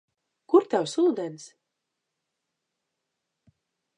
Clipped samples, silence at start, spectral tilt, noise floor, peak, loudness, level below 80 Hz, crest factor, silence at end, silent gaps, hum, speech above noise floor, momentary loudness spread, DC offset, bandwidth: under 0.1%; 0.5 s; -5 dB/octave; -83 dBFS; -8 dBFS; -24 LUFS; -84 dBFS; 22 dB; 2.5 s; none; none; 59 dB; 15 LU; under 0.1%; 10.5 kHz